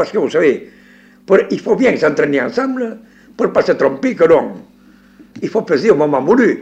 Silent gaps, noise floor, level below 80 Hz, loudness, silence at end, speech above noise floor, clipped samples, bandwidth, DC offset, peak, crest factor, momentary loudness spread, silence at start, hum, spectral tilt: none; -45 dBFS; -54 dBFS; -14 LUFS; 0 s; 31 dB; under 0.1%; 8.4 kHz; under 0.1%; -2 dBFS; 14 dB; 8 LU; 0 s; none; -6.5 dB/octave